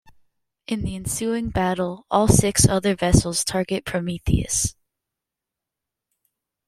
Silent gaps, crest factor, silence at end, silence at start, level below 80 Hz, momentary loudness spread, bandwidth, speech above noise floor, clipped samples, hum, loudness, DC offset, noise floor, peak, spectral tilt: none; 22 dB; 1.95 s; 0.7 s; -36 dBFS; 10 LU; 16 kHz; 65 dB; under 0.1%; none; -21 LUFS; under 0.1%; -86 dBFS; -2 dBFS; -4.5 dB/octave